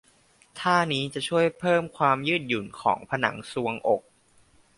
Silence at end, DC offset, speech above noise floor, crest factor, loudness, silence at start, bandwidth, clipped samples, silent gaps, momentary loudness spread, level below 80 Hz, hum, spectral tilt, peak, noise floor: 0.8 s; under 0.1%; 35 dB; 22 dB; -26 LUFS; 0.55 s; 11.5 kHz; under 0.1%; none; 7 LU; -64 dBFS; none; -5 dB/octave; -6 dBFS; -60 dBFS